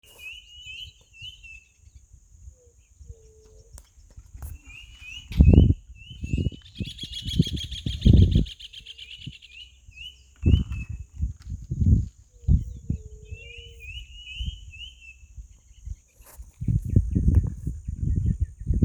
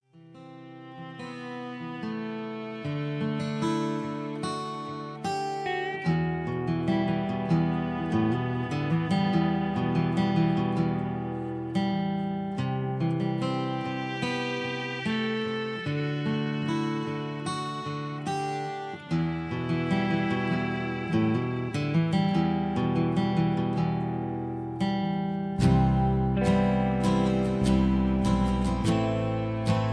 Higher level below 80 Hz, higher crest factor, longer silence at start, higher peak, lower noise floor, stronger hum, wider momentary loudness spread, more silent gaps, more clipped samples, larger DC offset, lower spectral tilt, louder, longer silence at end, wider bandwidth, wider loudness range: first, -30 dBFS vs -44 dBFS; first, 24 dB vs 18 dB; about the same, 0.2 s vs 0.15 s; first, 0 dBFS vs -10 dBFS; first, -56 dBFS vs -49 dBFS; neither; first, 23 LU vs 9 LU; neither; neither; neither; about the same, -7 dB/octave vs -7.5 dB/octave; first, -25 LUFS vs -28 LUFS; about the same, 0 s vs 0 s; about the same, 12 kHz vs 11 kHz; first, 19 LU vs 6 LU